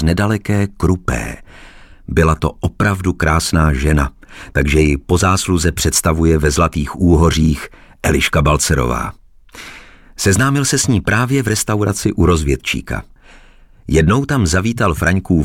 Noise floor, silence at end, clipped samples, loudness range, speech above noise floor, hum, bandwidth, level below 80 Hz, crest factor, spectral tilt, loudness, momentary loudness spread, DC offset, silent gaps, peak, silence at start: -43 dBFS; 0 s; under 0.1%; 3 LU; 29 dB; none; 17 kHz; -24 dBFS; 12 dB; -5 dB/octave; -15 LUFS; 9 LU; under 0.1%; none; -2 dBFS; 0 s